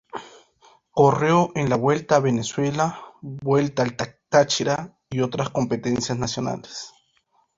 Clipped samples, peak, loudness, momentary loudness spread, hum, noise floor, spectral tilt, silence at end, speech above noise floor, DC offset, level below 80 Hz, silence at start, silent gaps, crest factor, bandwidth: under 0.1%; -2 dBFS; -22 LUFS; 15 LU; none; -66 dBFS; -5.5 dB/octave; 0.7 s; 44 dB; under 0.1%; -56 dBFS; 0.15 s; none; 20 dB; 7.8 kHz